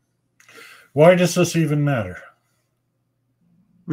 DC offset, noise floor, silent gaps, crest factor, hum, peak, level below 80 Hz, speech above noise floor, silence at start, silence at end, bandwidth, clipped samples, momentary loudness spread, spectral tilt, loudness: under 0.1%; -70 dBFS; none; 20 dB; none; 0 dBFS; -62 dBFS; 54 dB; 0.95 s; 0 s; 16 kHz; under 0.1%; 17 LU; -6 dB/octave; -17 LUFS